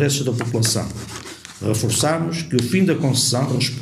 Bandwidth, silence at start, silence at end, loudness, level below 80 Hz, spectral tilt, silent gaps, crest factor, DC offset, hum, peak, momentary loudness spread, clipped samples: 15.5 kHz; 0 s; 0 s; -19 LUFS; -50 dBFS; -4.5 dB/octave; none; 18 dB; under 0.1%; none; -2 dBFS; 13 LU; under 0.1%